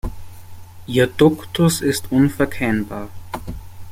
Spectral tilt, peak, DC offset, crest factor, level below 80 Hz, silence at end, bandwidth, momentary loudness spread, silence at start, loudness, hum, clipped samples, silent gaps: -5.5 dB/octave; -2 dBFS; under 0.1%; 18 dB; -38 dBFS; 0 s; 16.5 kHz; 18 LU; 0.05 s; -18 LUFS; none; under 0.1%; none